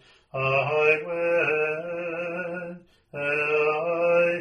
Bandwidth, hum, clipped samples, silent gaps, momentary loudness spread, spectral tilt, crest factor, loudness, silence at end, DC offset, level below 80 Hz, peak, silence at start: 9 kHz; none; under 0.1%; none; 12 LU; -6.5 dB/octave; 18 dB; -24 LUFS; 0 s; under 0.1%; -66 dBFS; -8 dBFS; 0.35 s